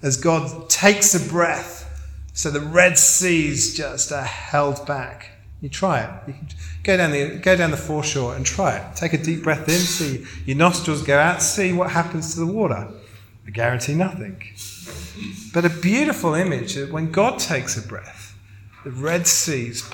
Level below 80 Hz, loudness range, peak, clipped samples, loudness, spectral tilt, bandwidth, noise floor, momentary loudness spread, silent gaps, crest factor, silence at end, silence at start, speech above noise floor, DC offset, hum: -44 dBFS; 7 LU; 0 dBFS; under 0.1%; -19 LUFS; -3.5 dB/octave; 17.5 kHz; -44 dBFS; 19 LU; none; 20 dB; 0 s; 0 s; 23 dB; under 0.1%; none